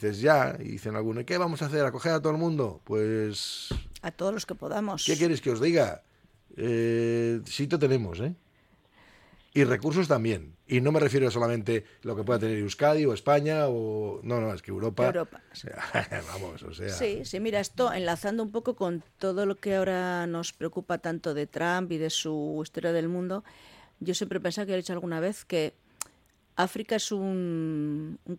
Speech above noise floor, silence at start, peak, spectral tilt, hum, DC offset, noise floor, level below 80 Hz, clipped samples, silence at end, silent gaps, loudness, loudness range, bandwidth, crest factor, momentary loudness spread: 35 dB; 0 s; -8 dBFS; -5.5 dB/octave; none; under 0.1%; -63 dBFS; -56 dBFS; under 0.1%; 0 s; none; -29 LUFS; 5 LU; 16.5 kHz; 22 dB; 11 LU